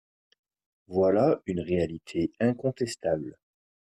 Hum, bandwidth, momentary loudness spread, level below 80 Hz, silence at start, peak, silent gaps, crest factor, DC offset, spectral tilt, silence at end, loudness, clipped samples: none; 13.5 kHz; 9 LU; -62 dBFS; 0.9 s; -12 dBFS; none; 16 dB; under 0.1%; -7 dB/octave; 0.65 s; -28 LUFS; under 0.1%